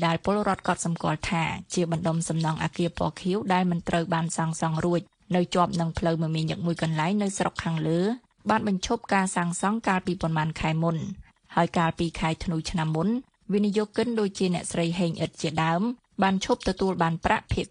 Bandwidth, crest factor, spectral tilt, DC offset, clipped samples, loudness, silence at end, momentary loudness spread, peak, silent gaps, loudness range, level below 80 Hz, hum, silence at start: 11 kHz; 20 dB; -5.5 dB/octave; under 0.1%; under 0.1%; -27 LUFS; 0.05 s; 4 LU; -6 dBFS; none; 1 LU; -48 dBFS; none; 0 s